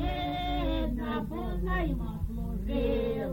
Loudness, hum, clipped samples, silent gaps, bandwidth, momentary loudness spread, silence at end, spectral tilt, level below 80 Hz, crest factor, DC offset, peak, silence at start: -32 LUFS; none; under 0.1%; none; 17 kHz; 6 LU; 0 s; -8 dB/octave; -34 dBFS; 12 dB; under 0.1%; -18 dBFS; 0 s